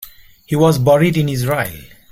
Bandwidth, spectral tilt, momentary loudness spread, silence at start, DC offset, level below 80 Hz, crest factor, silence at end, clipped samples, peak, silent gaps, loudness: 16.5 kHz; -6.5 dB/octave; 9 LU; 0 s; under 0.1%; -46 dBFS; 14 dB; 0.25 s; under 0.1%; -2 dBFS; none; -15 LUFS